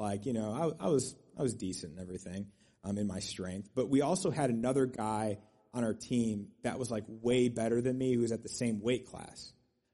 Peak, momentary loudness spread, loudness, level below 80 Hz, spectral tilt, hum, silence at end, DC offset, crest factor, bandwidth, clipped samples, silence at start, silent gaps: -18 dBFS; 14 LU; -34 LUFS; -64 dBFS; -5.5 dB/octave; none; 0.45 s; under 0.1%; 16 dB; 11.5 kHz; under 0.1%; 0 s; none